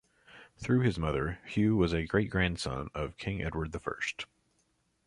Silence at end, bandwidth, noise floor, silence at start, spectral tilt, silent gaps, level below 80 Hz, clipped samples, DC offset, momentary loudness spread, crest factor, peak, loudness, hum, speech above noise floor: 0.85 s; 11.5 kHz; -74 dBFS; 0.3 s; -6.5 dB/octave; none; -46 dBFS; under 0.1%; under 0.1%; 9 LU; 20 dB; -12 dBFS; -32 LUFS; none; 43 dB